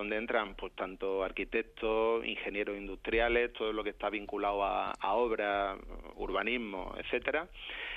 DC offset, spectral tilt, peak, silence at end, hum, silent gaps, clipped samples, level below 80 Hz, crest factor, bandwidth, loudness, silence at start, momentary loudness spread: under 0.1%; -6 dB/octave; -14 dBFS; 0 s; none; none; under 0.1%; -52 dBFS; 20 dB; 8.8 kHz; -34 LUFS; 0 s; 10 LU